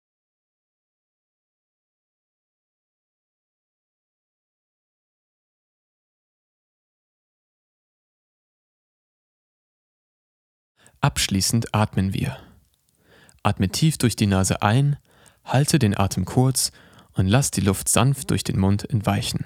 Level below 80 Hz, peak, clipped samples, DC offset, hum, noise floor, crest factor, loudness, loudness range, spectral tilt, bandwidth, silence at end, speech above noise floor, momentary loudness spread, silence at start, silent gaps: -50 dBFS; -2 dBFS; under 0.1%; under 0.1%; none; -63 dBFS; 24 dB; -21 LUFS; 5 LU; -5 dB/octave; 16.5 kHz; 0 s; 42 dB; 6 LU; 11 s; none